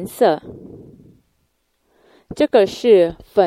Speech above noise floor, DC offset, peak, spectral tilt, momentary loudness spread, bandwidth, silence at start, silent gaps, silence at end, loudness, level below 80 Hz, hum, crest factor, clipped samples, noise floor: 52 dB; under 0.1%; 0 dBFS; -5.5 dB/octave; 24 LU; 15.5 kHz; 0 s; none; 0 s; -16 LUFS; -52 dBFS; none; 18 dB; under 0.1%; -67 dBFS